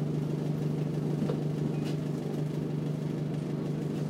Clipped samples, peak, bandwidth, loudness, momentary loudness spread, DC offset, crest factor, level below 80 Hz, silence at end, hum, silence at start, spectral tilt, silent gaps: under 0.1%; -18 dBFS; 11.5 kHz; -32 LUFS; 2 LU; under 0.1%; 12 dB; -62 dBFS; 0 s; 50 Hz at -35 dBFS; 0 s; -8.5 dB/octave; none